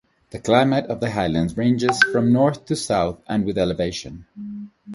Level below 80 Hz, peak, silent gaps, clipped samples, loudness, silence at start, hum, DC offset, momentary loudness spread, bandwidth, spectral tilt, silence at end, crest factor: -46 dBFS; 0 dBFS; none; under 0.1%; -20 LUFS; 0.35 s; none; under 0.1%; 18 LU; 11.5 kHz; -5.5 dB/octave; 0 s; 20 dB